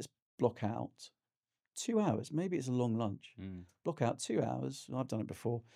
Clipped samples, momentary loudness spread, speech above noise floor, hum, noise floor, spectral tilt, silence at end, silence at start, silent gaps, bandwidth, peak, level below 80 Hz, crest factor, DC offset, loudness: under 0.1%; 14 LU; over 53 dB; none; under -90 dBFS; -6.5 dB/octave; 0.15 s; 0 s; 0.22-0.38 s, 1.37-1.43 s; 15 kHz; -16 dBFS; -76 dBFS; 22 dB; under 0.1%; -37 LUFS